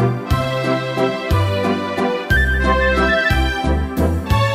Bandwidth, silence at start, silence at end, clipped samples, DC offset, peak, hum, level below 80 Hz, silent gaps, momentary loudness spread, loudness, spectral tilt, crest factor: 16 kHz; 0 s; 0 s; under 0.1%; under 0.1%; -4 dBFS; none; -24 dBFS; none; 5 LU; -17 LUFS; -6 dB/octave; 14 dB